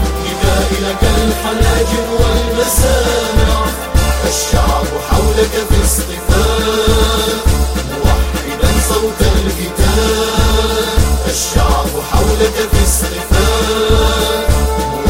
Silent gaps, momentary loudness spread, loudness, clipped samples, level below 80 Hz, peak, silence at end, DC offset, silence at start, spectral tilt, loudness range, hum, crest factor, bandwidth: none; 4 LU; -13 LUFS; under 0.1%; -16 dBFS; 0 dBFS; 0 s; under 0.1%; 0 s; -4.5 dB/octave; 1 LU; none; 12 dB; 16.5 kHz